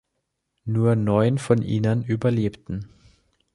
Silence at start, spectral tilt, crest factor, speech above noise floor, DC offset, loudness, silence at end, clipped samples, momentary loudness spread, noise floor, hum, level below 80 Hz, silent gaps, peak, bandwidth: 0.65 s; -8 dB/octave; 18 dB; 56 dB; under 0.1%; -22 LUFS; 0.7 s; under 0.1%; 14 LU; -77 dBFS; none; -50 dBFS; none; -4 dBFS; 11.5 kHz